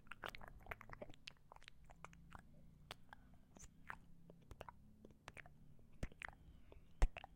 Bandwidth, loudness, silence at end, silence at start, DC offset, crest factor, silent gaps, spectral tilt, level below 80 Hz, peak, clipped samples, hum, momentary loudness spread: 16 kHz; -56 LUFS; 0 s; 0 s; under 0.1%; 28 dB; none; -4.5 dB/octave; -52 dBFS; -22 dBFS; under 0.1%; none; 14 LU